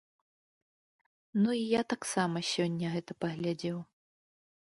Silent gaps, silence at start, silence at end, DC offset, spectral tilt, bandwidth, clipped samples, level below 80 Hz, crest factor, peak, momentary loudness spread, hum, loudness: none; 1.35 s; 0.85 s; under 0.1%; -5 dB/octave; 11.5 kHz; under 0.1%; -74 dBFS; 20 dB; -14 dBFS; 8 LU; none; -33 LUFS